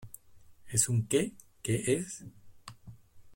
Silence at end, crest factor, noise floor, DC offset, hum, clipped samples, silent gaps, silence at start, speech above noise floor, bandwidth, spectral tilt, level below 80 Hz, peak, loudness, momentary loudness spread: 0 s; 24 dB; -55 dBFS; under 0.1%; none; under 0.1%; none; 0 s; 25 dB; 16.5 kHz; -4.5 dB/octave; -62 dBFS; -10 dBFS; -31 LUFS; 24 LU